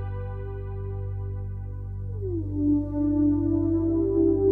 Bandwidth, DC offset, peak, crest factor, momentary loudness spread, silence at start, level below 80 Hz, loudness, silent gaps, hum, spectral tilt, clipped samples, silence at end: 2.6 kHz; under 0.1%; -12 dBFS; 14 dB; 12 LU; 0 s; -38 dBFS; -27 LUFS; none; 50 Hz at -80 dBFS; -13 dB/octave; under 0.1%; 0 s